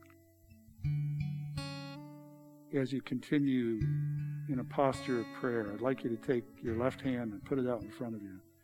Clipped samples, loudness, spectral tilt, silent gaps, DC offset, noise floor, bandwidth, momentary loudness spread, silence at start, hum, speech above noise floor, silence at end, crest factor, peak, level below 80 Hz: under 0.1%; -36 LUFS; -8 dB/octave; none; under 0.1%; -61 dBFS; 13.5 kHz; 12 LU; 0 s; none; 26 dB; 0.25 s; 20 dB; -16 dBFS; -62 dBFS